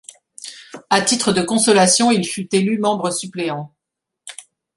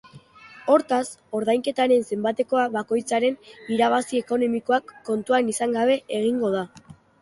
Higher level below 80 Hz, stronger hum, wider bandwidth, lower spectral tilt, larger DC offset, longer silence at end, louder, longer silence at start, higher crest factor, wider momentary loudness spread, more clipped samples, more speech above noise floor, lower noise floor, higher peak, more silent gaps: first, -62 dBFS vs -68 dBFS; neither; about the same, 11.5 kHz vs 11.5 kHz; about the same, -3.5 dB/octave vs -4.5 dB/octave; neither; about the same, 0.35 s vs 0.3 s; first, -17 LUFS vs -23 LUFS; first, 0.45 s vs 0.15 s; about the same, 18 dB vs 18 dB; first, 23 LU vs 8 LU; neither; first, 65 dB vs 25 dB; first, -82 dBFS vs -48 dBFS; first, -2 dBFS vs -6 dBFS; neither